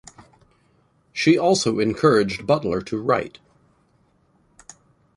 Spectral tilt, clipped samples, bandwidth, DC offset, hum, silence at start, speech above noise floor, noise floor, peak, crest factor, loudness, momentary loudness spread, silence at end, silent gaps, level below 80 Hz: -5 dB/octave; under 0.1%; 11.5 kHz; under 0.1%; none; 1.15 s; 42 dB; -62 dBFS; -4 dBFS; 20 dB; -20 LUFS; 8 LU; 1.9 s; none; -54 dBFS